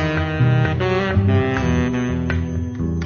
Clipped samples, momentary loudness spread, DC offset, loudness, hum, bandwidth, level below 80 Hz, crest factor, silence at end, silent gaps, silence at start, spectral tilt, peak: under 0.1%; 6 LU; under 0.1%; -19 LUFS; none; 6.8 kHz; -32 dBFS; 14 dB; 0 s; none; 0 s; -7.5 dB/octave; -6 dBFS